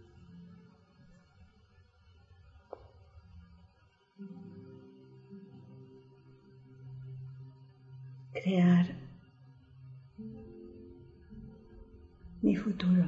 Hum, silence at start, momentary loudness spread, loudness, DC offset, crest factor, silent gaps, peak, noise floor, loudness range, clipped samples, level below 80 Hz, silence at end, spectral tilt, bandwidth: none; 0.35 s; 28 LU; -32 LUFS; under 0.1%; 22 dB; none; -16 dBFS; -67 dBFS; 23 LU; under 0.1%; -62 dBFS; 0 s; -8 dB/octave; 6.8 kHz